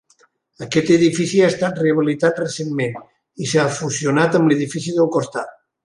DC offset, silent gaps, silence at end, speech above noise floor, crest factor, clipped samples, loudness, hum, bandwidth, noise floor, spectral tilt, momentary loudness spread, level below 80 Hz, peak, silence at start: under 0.1%; none; 0.35 s; 40 dB; 16 dB; under 0.1%; -18 LUFS; none; 11.5 kHz; -58 dBFS; -5.5 dB/octave; 12 LU; -60 dBFS; -2 dBFS; 0.6 s